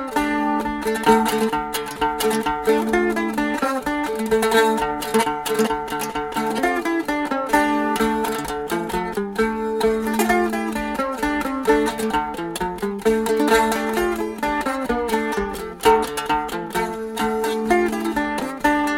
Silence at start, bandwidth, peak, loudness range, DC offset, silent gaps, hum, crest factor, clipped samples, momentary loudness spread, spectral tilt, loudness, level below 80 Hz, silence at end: 0 s; 17 kHz; -2 dBFS; 2 LU; under 0.1%; none; none; 18 dB; under 0.1%; 7 LU; -4 dB/octave; -21 LUFS; -44 dBFS; 0 s